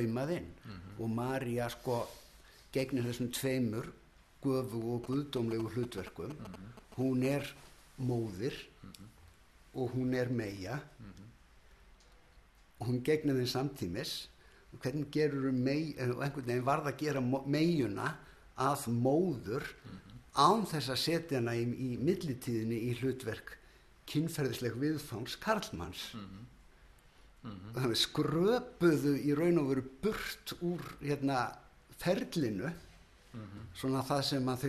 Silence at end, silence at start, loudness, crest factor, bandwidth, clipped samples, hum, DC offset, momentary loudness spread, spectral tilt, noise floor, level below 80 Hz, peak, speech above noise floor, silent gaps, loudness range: 0 s; 0 s; -35 LUFS; 22 dB; 13.5 kHz; under 0.1%; none; under 0.1%; 18 LU; -6 dB/octave; -62 dBFS; -62 dBFS; -14 dBFS; 27 dB; none; 6 LU